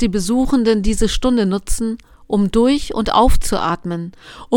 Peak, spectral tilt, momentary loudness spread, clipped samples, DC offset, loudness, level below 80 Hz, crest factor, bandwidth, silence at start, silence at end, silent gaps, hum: 0 dBFS; -5 dB/octave; 10 LU; under 0.1%; under 0.1%; -17 LUFS; -24 dBFS; 16 dB; 17 kHz; 0 s; 0 s; none; none